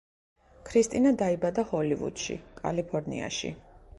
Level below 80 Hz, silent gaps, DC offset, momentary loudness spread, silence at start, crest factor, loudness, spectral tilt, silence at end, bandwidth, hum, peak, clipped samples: -56 dBFS; none; under 0.1%; 11 LU; 0.65 s; 18 dB; -29 LUFS; -5 dB/octave; 0.2 s; 11.5 kHz; none; -12 dBFS; under 0.1%